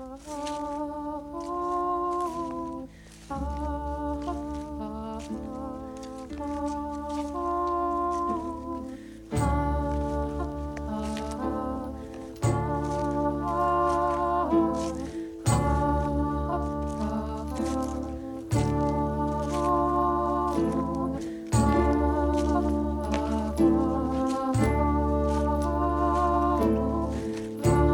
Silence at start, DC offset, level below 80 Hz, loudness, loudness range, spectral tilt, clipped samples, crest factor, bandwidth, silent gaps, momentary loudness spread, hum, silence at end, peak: 0 s; under 0.1%; -36 dBFS; -28 LUFS; 8 LU; -7 dB/octave; under 0.1%; 16 dB; 17 kHz; none; 12 LU; none; 0 s; -10 dBFS